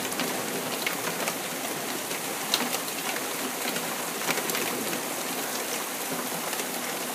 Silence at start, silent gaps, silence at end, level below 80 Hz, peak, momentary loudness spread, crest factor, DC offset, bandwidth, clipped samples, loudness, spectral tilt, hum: 0 s; none; 0 s; -76 dBFS; -6 dBFS; 4 LU; 24 dB; under 0.1%; 16 kHz; under 0.1%; -29 LUFS; -1.5 dB/octave; none